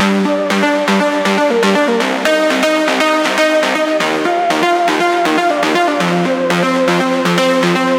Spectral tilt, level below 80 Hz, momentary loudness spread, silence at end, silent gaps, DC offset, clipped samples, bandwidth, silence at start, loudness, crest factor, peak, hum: -4.5 dB/octave; -62 dBFS; 2 LU; 0 s; none; under 0.1%; under 0.1%; 17 kHz; 0 s; -13 LUFS; 12 dB; 0 dBFS; none